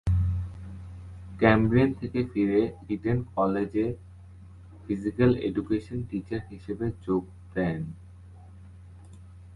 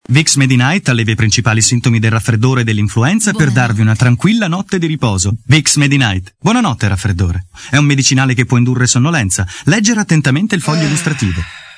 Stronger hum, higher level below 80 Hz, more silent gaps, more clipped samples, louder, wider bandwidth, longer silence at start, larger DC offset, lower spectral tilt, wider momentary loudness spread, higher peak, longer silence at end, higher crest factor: neither; about the same, -42 dBFS vs -38 dBFS; neither; second, under 0.1% vs 0.2%; second, -27 LUFS vs -12 LUFS; about the same, 11 kHz vs 11 kHz; about the same, 0.05 s vs 0.1 s; neither; first, -9 dB/octave vs -4.5 dB/octave; first, 19 LU vs 6 LU; second, -6 dBFS vs 0 dBFS; about the same, 0 s vs 0.05 s; first, 22 dB vs 12 dB